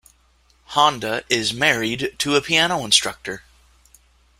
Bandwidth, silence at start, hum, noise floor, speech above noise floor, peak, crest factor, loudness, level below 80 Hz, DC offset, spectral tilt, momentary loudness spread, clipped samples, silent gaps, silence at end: 16.5 kHz; 0.7 s; none; -58 dBFS; 38 dB; -2 dBFS; 20 dB; -19 LUFS; -54 dBFS; under 0.1%; -2 dB/octave; 12 LU; under 0.1%; none; 1 s